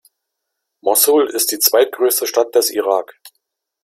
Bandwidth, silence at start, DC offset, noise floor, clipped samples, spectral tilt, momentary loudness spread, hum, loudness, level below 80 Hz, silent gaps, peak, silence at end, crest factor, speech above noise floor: 16.5 kHz; 0.85 s; under 0.1%; -77 dBFS; under 0.1%; 0 dB/octave; 7 LU; none; -15 LUFS; -70 dBFS; none; 0 dBFS; 0.55 s; 18 dB; 62 dB